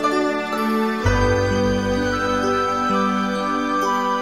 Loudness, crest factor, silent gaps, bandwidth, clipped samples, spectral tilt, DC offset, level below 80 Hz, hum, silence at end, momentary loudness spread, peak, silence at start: -20 LUFS; 14 dB; none; 16 kHz; under 0.1%; -5.5 dB/octave; 0.3%; -34 dBFS; none; 0 s; 3 LU; -4 dBFS; 0 s